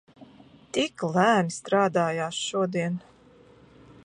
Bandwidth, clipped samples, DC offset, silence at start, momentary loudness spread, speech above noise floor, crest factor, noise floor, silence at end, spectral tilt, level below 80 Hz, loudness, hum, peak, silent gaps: 11 kHz; under 0.1%; under 0.1%; 0.2 s; 9 LU; 30 dB; 20 dB; -54 dBFS; 1.05 s; -5 dB/octave; -68 dBFS; -26 LUFS; none; -8 dBFS; none